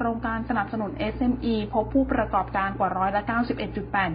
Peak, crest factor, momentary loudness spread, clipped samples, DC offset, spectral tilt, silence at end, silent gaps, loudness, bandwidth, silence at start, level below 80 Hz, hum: -10 dBFS; 16 dB; 5 LU; under 0.1%; under 0.1%; -11 dB/octave; 0 s; none; -26 LUFS; 5.2 kHz; 0 s; -40 dBFS; none